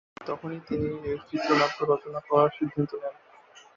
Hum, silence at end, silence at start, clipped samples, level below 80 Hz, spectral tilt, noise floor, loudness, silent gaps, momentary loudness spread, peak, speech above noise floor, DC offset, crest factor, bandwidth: none; 0.2 s; 0.2 s; under 0.1%; -58 dBFS; -6.5 dB/octave; -54 dBFS; -28 LUFS; none; 12 LU; -8 dBFS; 27 dB; under 0.1%; 20 dB; 7.4 kHz